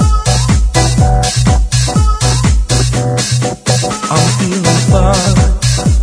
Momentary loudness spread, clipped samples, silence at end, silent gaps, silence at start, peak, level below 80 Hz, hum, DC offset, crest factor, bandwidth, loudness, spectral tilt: 3 LU; under 0.1%; 0 s; none; 0 s; 0 dBFS; -16 dBFS; none; under 0.1%; 10 dB; 11 kHz; -11 LUFS; -4.5 dB/octave